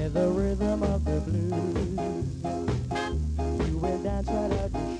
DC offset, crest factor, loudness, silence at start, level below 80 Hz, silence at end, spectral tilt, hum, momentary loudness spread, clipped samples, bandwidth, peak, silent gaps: under 0.1%; 14 dB; -29 LUFS; 0 s; -34 dBFS; 0 s; -7.5 dB/octave; none; 4 LU; under 0.1%; 10.5 kHz; -14 dBFS; none